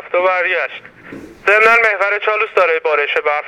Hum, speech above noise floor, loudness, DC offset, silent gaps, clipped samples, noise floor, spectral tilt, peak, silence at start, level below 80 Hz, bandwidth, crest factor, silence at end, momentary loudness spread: none; 20 dB; -13 LUFS; under 0.1%; none; under 0.1%; -35 dBFS; -3 dB/octave; 0 dBFS; 0 s; -58 dBFS; 14 kHz; 16 dB; 0 s; 10 LU